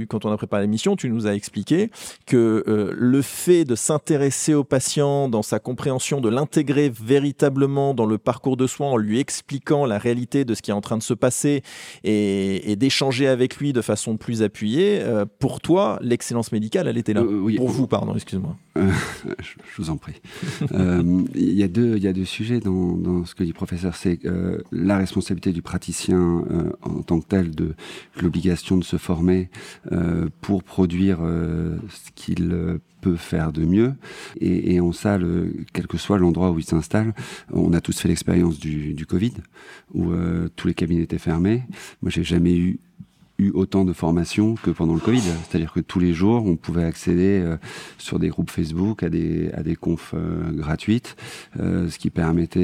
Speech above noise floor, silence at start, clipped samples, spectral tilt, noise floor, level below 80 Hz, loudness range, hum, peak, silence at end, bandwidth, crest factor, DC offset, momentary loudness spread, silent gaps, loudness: 25 dB; 0 s; under 0.1%; -6 dB/octave; -46 dBFS; -44 dBFS; 3 LU; none; -4 dBFS; 0 s; 15.5 kHz; 18 dB; under 0.1%; 9 LU; none; -22 LUFS